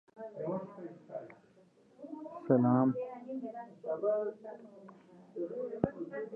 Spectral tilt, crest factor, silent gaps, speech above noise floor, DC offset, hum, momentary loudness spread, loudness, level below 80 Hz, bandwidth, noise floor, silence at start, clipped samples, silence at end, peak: -11.5 dB/octave; 24 dB; none; 32 dB; under 0.1%; none; 22 LU; -35 LUFS; -70 dBFS; 3 kHz; -64 dBFS; 0.15 s; under 0.1%; 0 s; -12 dBFS